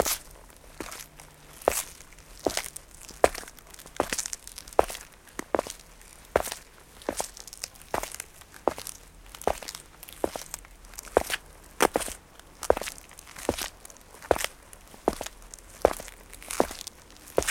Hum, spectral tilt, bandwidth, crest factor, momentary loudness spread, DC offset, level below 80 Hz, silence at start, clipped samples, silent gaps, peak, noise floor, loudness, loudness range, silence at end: none; -2.5 dB/octave; 17 kHz; 30 dB; 20 LU; under 0.1%; -50 dBFS; 0 s; under 0.1%; none; -2 dBFS; -50 dBFS; -31 LUFS; 4 LU; 0 s